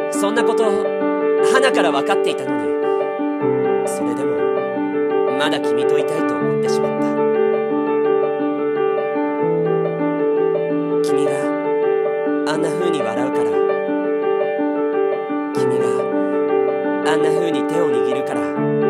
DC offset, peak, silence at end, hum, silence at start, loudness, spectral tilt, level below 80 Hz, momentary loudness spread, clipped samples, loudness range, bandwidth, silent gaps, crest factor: under 0.1%; -2 dBFS; 0 s; none; 0 s; -18 LUFS; -5.5 dB/octave; -70 dBFS; 3 LU; under 0.1%; 1 LU; 13 kHz; none; 16 dB